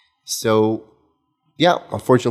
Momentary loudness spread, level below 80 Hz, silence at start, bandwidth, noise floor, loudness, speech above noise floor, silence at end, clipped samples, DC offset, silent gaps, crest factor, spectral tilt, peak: 8 LU; -60 dBFS; 0.3 s; 15.5 kHz; -66 dBFS; -19 LUFS; 49 dB; 0 s; under 0.1%; under 0.1%; none; 20 dB; -5 dB/octave; 0 dBFS